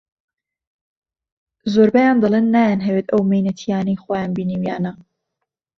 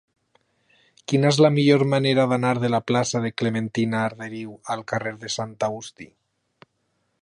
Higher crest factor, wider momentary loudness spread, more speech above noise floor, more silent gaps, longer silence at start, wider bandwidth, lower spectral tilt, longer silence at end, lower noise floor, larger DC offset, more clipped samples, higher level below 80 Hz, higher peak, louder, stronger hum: about the same, 16 dB vs 20 dB; second, 9 LU vs 16 LU; first, 63 dB vs 50 dB; neither; first, 1.65 s vs 1.1 s; second, 6.6 kHz vs 11 kHz; first, -8 dB/octave vs -5.5 dB/octave; second, 0.85 s vs 1.15 s; first, -79 dBFS vs -72 dBFS; neither; neither; first, -58 dBFS vs -64 dBFS; about the same, -2 dBFS vs -4 dBFS; first, -18 LUFS vs -22 LUFS; neither